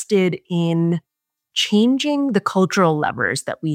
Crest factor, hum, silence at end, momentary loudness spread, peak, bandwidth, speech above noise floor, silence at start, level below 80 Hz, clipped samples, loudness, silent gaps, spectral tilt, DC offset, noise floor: 16 dB; none; 0 s; 6 LU; -4 dBFS; 15.5 kHz; 48 dB; 0 s; -64 dBFS; under 0.1%; -19 LUFS; none; -5.5 dB/octave; under 0.1%; -66 dBFS